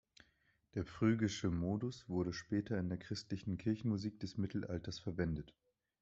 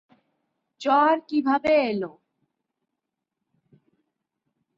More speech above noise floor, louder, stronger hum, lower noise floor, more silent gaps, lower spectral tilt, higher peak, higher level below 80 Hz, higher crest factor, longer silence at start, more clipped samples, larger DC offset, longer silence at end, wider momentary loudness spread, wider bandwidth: second, 38 dB vs 62 dB; second, -40 LUFS vs -22 LUFS; neither; second, -77 dBFS vs -84 dBFS; neither; about the same, -6.5 dB/octave vs -6 dB/octave; second, -22 dBFS vs -8 dBFS; first, -64 dBFS vs -70 dBFS; about the same, 20 dB vs 18 dB; about the same, 0.75 s vs 0.8 s; neither; neither; second, 0.5 s vs 2.7 s; second, 8 LU vs 11 LU; about the same, 8 kHz vs 7.6 kHz